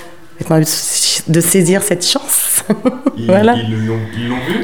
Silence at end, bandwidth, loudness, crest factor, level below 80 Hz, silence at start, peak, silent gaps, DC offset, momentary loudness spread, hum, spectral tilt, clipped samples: 0 s; over 20 kHz; -13 LUFS; 14 dB; -50 dBFS; 0 s; 0 dBFS; none; 2%; 8 LU; none; -4 dB/octave; under 0.1%